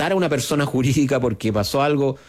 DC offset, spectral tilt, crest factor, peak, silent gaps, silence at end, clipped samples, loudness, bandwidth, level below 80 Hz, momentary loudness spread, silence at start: under 0.1%; -5.5 dB/octave; 10 dB; -8 dBFS; none; 0.1 s; under 0.1%; -20 LUFS; 16 kHz; -48 dBFS; 2 LU; 0 s